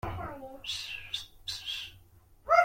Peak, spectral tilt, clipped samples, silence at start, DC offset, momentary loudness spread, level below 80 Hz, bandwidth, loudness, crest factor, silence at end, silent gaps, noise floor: -10 dBFS; -3 dB/octave; under 0.1%; 0.05 s; under 0.1%; 7 LU; -54 dBFS; 16.5 kHz; -35 LUFS; 24 dB; 0 s; none; -59 dBFS